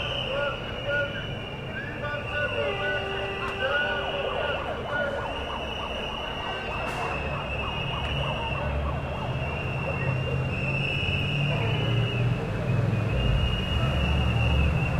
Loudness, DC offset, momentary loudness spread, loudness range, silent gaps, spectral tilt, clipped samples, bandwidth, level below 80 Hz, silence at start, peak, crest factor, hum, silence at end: -28 LUFS; under 0.1%; 6 LU; 4 LU; none; -6.5 dB/octave; under 0.1%; 12 kHz; -36 dBFS; 0 s; -12 dBFS; 16 dB; none; 0 s